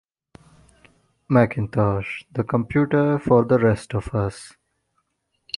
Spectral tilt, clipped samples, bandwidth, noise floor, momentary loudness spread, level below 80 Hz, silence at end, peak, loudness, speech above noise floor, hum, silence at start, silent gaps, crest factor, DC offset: -8 dB/octave; under 0.1%; 11.5 kHz; -73 dBFS; 10 LU; -46 dBFS; 1.1 s; -2 dBFS; -21 LUFS; 52 dB; none; 1.3 s; none; 20 dB; under 0.1%